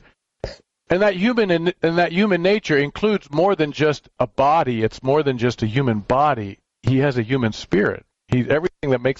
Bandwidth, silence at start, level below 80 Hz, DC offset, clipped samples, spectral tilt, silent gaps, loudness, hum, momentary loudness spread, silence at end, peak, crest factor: 7.8 kHz; 0.45 s; -48 dBFS; under 0.1%; under 0.1%; -7 dB/octave; none; -20 LUFS; none; 7 LU; 0 s; -4 dBFS; 16 dB